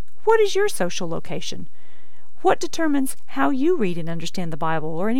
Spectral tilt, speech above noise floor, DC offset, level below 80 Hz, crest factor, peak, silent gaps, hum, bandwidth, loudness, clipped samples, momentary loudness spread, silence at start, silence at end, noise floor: -5 dB/octave; 34 dB; 10%; -58 dBFS; 18 dB; -6 dBFS; none; none; 18 kHz; -23 LUFS; under 0.1%; 11 LU; 0.25 s; 0 s; -57 dBFS